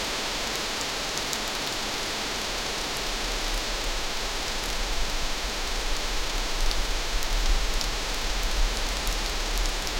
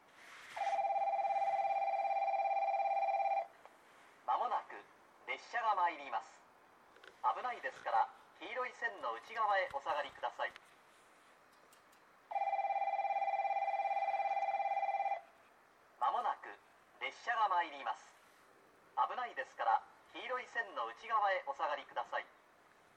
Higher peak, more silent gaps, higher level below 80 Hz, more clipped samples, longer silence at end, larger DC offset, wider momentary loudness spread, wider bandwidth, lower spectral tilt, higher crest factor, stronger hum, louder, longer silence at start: first, -6 dBFS vs -22 dBFS; neither; first, -30 dBFS vs -88 dBFS; neither; second, 0 s vs 0.7 s; neither; second, 1 LU vs 10 LU; first, 17 kHz vs 10 kHz; about the same, -2 dB/octave vs -2 dB/octave; about the same, 22 dB vs 18 dB; neither; first, -28 LUFS vs -38 LUFS; second, 0 s vs 0.2 s